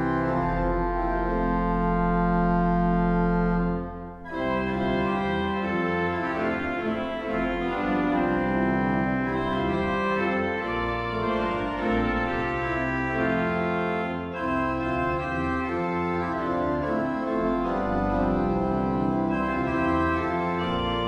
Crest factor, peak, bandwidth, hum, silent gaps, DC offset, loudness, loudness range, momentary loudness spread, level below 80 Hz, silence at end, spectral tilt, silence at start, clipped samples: 12 dB; -12 dBFS; 7.4 kHz; none; none; under 0.1%; -26 LUFS; 2 LU; 4 LU; -38 dBFS; 0 s; -8 dB/octave; 0 s; under 0.1%